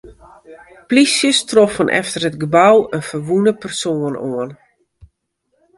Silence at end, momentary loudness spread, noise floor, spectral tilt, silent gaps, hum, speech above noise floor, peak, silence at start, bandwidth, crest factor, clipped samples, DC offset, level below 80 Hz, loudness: 1.25 s; 11 LU; -68 dBFS; -4 dB/octave; none; none; 53 dB; 0 dBFS; 0.05 s; 11.5 kHz; 16 dB; under 0.1%; under 0.1%; -54 dBFS; -15 LUFS